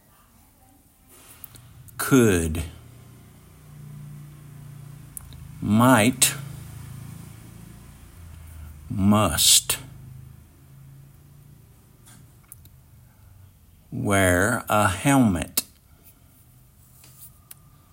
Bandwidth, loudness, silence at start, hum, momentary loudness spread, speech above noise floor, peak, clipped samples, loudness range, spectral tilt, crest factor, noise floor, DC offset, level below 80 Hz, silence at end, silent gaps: 16.5 kHz; -20 LUFS; 1.55 s; none; 27 LU; 37 dB; -4 dBFS; under 0.1%; 6 LU; -3.5 dB/octave; 24 dB; -56 dBFS; under 0.1%; -50 dBFS; 0.65 s; none